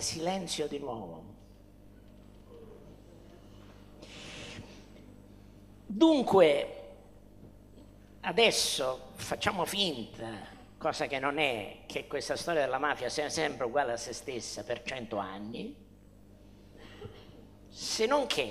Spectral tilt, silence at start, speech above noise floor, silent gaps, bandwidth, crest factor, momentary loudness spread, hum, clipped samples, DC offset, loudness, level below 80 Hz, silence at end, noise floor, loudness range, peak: -3 dB/octave; 0 s; 25 dB; none; 15.5 kHz; 24 dB; 24 LU; 50 Hz at -55 dBFS; under 0.1%; under 0.1%; -31 LUFS; -60 dBFS; 0 s; -56 dBFS; 20 LU; -10 dBFS